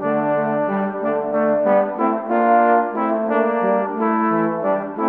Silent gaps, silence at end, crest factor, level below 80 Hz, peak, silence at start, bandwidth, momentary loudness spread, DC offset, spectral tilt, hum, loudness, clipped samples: none; 0 s; 14 dB; -64 dBFS; -4 dBFS; 0 s; 4.1 kHz; 6 LU; under 0.1%; -10.5 dB/octave; none; -19 LUFS; under 0.1%